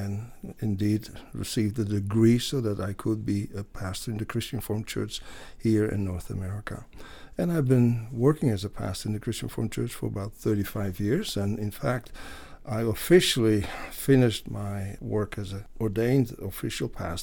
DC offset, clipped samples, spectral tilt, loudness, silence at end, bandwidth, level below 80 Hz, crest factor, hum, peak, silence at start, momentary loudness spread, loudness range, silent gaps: under 0.1%; under 0.1%; -6 dB/octave; -28 LUFS; 0 s; 19 kHz; -46 dBFS; 22 dB; none; -6 dBFS; 0 s; 15 LU; 5 LU; none